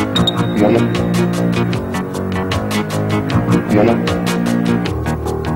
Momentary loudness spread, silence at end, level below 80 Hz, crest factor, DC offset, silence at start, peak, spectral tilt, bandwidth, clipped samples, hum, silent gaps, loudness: 7 LU; 0 s; -34 dBFS; 16 dB; under 0.1%; 0 s; 0 dBFS; -6.5 dB/octave; 16.5 kHz; under 0.1%; none; none; -16 LUFS